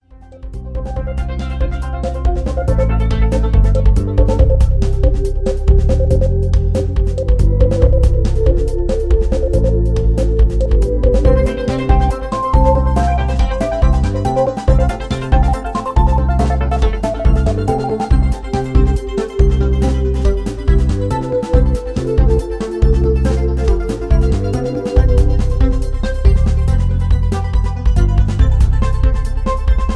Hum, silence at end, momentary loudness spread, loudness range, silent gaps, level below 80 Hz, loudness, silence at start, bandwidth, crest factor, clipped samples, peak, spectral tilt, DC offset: none; 0 s; 6 LU; 2 LU; none; -14 dBFS; -16 LUFS; 0.3 s; 10.5 kHz; 12 dB; under 0.1%; 0 dBFS; -8 dB/octave; under 0.1%